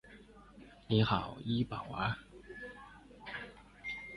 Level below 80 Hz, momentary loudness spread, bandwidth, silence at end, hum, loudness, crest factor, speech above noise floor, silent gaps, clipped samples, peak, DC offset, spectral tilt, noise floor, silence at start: -58 dBFS; 25 LU; 11 kHz; 0 s; none; -37 LUFS; 22 dB; 23 dB; none; under 0.1%; -16 dBFS; under 0.1%; -7.5 dB/octave; -57 dBFS; 0.05 s